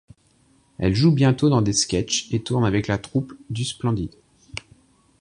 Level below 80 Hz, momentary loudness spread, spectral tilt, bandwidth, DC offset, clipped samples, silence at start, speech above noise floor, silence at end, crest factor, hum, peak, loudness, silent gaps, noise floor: -44 dBFS; 17 LU; -5 dB/octave; 11 kHz; under 0.1%; under 0.1%; 0.8 s; 39 dB; 0.6 s; 18 dB; none; -4 dBFS; -22 LUFS; none; -60 dBFS